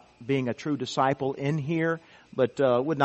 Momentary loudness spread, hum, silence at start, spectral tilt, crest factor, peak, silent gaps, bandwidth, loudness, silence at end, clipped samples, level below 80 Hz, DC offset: 6 LU; none; 0.2 s; -6.5 dB/octave; 20 dB; -6 dBFS; none; 8.4 kHz; -27 LUFS; 0 s; under 0.1%; -66 dBFS; under 0.1%